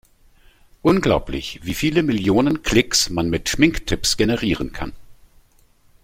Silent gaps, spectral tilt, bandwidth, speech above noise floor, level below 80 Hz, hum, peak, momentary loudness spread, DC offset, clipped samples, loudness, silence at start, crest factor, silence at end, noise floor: none; -4 dB/octave; 16.5 kHz; 36 dB; -36 dBFS; none; -2 dBFS; 11 LU; under 0.1%; under 0.1%; -19 LUFS; 0.85 s; 20 dB; 0.9 s; -55 dBFS